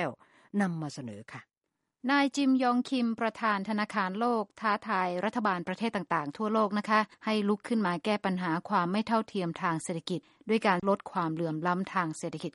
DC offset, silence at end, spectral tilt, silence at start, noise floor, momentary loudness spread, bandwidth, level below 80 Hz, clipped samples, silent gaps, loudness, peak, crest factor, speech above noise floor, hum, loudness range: under 0.1%; 0.05 s; -5.5 dB/octave; 0 s; -85 dBFS; 10 LU; 11.5 kHz; -74 dBFS; under 0.1%; none; -30 LUFS; -10 dBFS; 20 dB; 55 dB; none; 2 LU